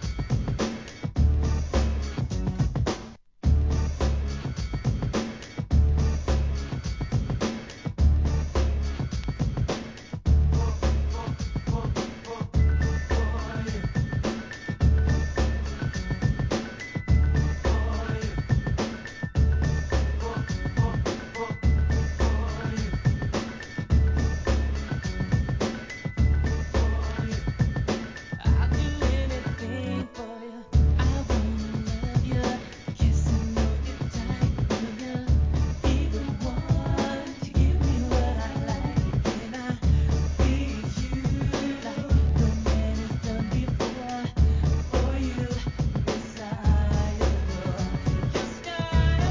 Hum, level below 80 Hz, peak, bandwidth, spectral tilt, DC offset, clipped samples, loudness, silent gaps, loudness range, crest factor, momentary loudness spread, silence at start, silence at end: none; -28 dBFS; -10 dBFS; 7.6 kHz; -6.5 dB/octave; 0.1%; under 0.1%; -27 LUFS; none; 2 LU; 16 dB; 8 LU; 0 s; 0 s